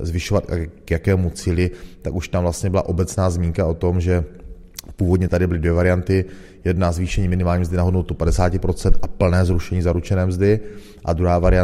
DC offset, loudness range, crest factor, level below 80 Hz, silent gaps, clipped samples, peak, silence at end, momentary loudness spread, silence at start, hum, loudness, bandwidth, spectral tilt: under 0.1%; 2 LU; 18 dB; -28 dBFS; none; under 0.1%; 0 dBFS; 0 s; 9 LU; 0 s; none; -20 LUFS; 13.5 kHz; -7 dB/octave